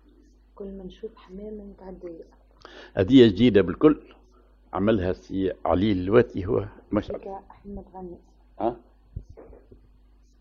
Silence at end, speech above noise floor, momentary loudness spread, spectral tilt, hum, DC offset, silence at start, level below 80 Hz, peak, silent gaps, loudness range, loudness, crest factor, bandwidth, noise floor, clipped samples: 1 s; 32 dB; 23 LU; -8.5 dB/octave; none; under 0.1%; 0.6 s; -48 dBFS; -4 dBFS; none; 13 LU; -23 LUFS; 22 dB; 7.2 kHz; -56 dBFS; under 0.1%